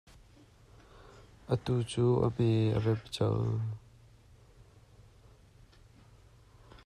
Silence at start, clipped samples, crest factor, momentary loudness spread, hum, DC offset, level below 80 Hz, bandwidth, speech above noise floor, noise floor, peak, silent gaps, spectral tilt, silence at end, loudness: 0.95 s; under 0.1%; 18 dB; 10 LU; none; under 0.1%; -58 dBFS; 11 kHz; 30 dB; -59 dBFS; -16 dBFS; none; -7.5 dB/octave; 0.1 s; -31 LUFS